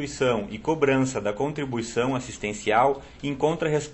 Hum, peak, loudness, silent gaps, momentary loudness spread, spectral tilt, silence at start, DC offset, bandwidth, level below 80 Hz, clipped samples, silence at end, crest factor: none; -8 dBFS; -25 LUFS; none; 8 LU; -5.5 dB/octave; 0 s; under 0.1%; 8.4 kHz; -50 dBFS; under 0.1%; 0 s; 18 dB